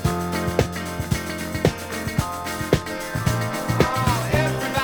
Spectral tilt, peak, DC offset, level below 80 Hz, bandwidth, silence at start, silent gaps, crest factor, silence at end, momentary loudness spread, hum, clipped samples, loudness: -5 dB/octave; -4 dBFS; under 0.1%; -38 dBFS; over 20 kHz; 0 s; none; 20 dB; 0 s; 7 LU; none; under 0.1%; -23 LUFS